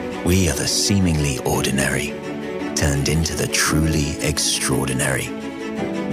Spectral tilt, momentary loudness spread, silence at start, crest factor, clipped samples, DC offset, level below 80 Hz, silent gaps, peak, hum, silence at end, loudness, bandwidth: -4 dB/octave; 9 LU; 0 s; 14 dB; under 0.1%; under 0.1%; -34 dBFS; none; -6 dBFS; none; 0 s; -20 LUFS; 15.5 kHz